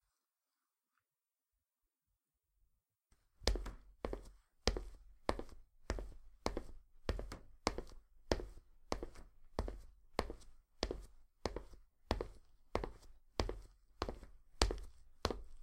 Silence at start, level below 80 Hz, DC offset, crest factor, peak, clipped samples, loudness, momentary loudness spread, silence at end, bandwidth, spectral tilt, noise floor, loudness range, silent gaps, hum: 3.4 s; -50 dBFS; under 0.1%; 40 dB; -6 dBFS; under 0.1%; -45 LUFS; 18 LU; 0 s; 15.5 kHz; -4.5 dB/octave; under -90 dBFS; 4 LU; none; none